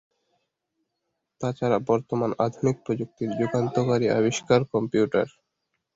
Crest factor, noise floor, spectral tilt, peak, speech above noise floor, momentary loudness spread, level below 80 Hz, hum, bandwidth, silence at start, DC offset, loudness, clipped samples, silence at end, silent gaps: 20 dB; -80 dBFS; -6.5 dB/octave; -6 dBFS; 56 dB; 8 LU; -62 dBFS; none; 8 kHz; 1.4 s; under 0.1%; -25 LUFS; under 0.1%; 0.65 s; none